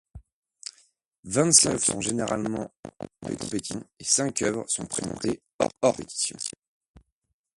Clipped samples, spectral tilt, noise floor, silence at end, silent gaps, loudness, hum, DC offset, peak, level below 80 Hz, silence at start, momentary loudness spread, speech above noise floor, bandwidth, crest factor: under 0.1%; -3 dB/octave; -64 dBFS; 1.1 s; 0.32-0.43 s, 1.19-1.23 s, 2.79-2.83 s, 5.54-5.59 s; -25 LUFS; none; under 0.1%; -2 dBFS; -56 dBFS; 0.15 s; 22 LU; 38 dB; 12 kHz; 26 dB